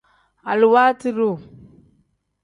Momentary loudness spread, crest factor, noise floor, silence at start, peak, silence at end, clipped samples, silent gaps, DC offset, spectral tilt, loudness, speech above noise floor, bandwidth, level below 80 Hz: 17 LU; 18 dB; -64 dBFS; 0.45 s; -4 dBFS; 1 s; under 0.1%; none; under 0.1%; -6.5 dB/octave; -17 LUFS; 47 dB; 10.5 kHz; -64 dBFS